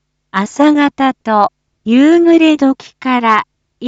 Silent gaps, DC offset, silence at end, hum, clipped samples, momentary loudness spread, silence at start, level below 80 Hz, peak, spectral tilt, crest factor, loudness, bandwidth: none; under 0.1%; 0 s; none; under 0.1%; 12 LU; 0.35 s; -58 dBFS; 0 dBFS; -5.5 dB/octave; 12 dB; -12 LUFS; 8 kHz